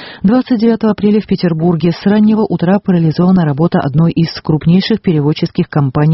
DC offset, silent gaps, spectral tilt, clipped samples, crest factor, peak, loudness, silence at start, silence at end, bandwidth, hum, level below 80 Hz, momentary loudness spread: under 0.1%; none; -7.5 dB/octave; under 0.1%; 10 dB; 0 dBFS; -12 LUFS; 0 s; 0 s; 6 kHz; none; -42 dBFS; 4 LU